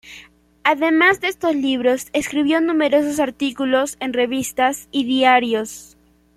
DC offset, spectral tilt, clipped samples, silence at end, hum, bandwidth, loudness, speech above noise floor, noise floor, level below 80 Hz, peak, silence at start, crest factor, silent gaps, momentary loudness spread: under 0.1%; -3 dB/octave; under 0.1%; 0.55 s; none; 15 kHz; -18 LUFS; 28 dB; -46 dBFS; -56 dBFS; -2 dBFS; 0.05 s; 18 dB; none; 8 LU